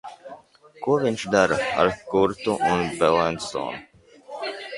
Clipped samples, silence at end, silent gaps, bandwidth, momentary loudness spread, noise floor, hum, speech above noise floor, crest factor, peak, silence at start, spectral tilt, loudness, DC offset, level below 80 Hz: under 0.1%; 0 s; none; 11.5 kHz; 19 LU; -48 dBFS; none; 26 dB; 20 dB; -4 dBFS; 0.05 s; -5 dB/octave; -23 LUFS; under 0.1%; -54 dBFS